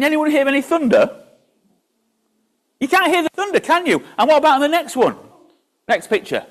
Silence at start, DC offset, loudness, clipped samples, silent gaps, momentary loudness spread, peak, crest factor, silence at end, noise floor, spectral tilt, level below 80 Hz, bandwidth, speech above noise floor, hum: 0 s; under 0.1%; -16 LUFS; under 0.1%; none; 7 LU; -4 dBFS; 14 dB; 0.1 s; -67 dBFS; -4 dB/octave; -64 dBFS; 14.5 kHz; 51 dB; none